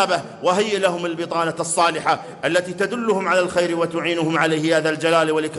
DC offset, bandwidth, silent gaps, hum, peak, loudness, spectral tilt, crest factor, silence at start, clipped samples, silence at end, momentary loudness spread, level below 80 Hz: under 0.1%; 12 kHz; none; none; -4 dBFS; -20 LUFS; -4 dB/octave; 16 dB; 0 s; under 0.1%; 0 s; 4 LU; -64 dBFS